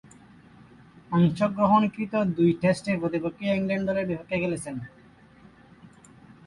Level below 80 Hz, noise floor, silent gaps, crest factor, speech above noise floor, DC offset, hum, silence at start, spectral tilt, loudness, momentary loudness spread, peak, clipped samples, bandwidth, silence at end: -58 dBFS; -53 dBFS; none; 18 dB; 29 dB; under 0.1%; none; 1.1 s; -7.5 dB/octave; -25 LUFS; 9 LU; -8 dBFS; under 0.1%; 11.5 kHz; 0.6 s